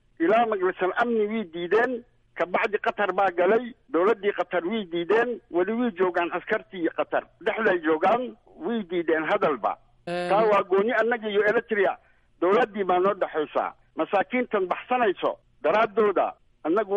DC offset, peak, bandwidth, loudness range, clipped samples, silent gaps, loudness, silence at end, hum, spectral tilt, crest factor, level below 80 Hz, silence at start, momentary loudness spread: under 0.1%; -12 dBFS; 10.5 kHz; 2 LU; under 0.1%; none; -25 LUFS; 0 s; none; -6.5 dB/octave; 14 dB; -64 dBFS; 0.2 s; 8 LU